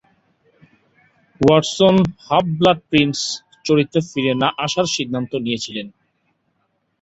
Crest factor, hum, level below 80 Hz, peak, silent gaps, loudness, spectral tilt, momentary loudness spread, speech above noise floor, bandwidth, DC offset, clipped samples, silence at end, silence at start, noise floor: 18 dB; none; -52 dBFS; -2 dBFS; none; -18 LUFS; -5 dB/octave; 10 LU; 51 dB; 8.2 kHz; under 0.1%; under 0.1%; 1.1 s; 1.4 s; -68 dBFS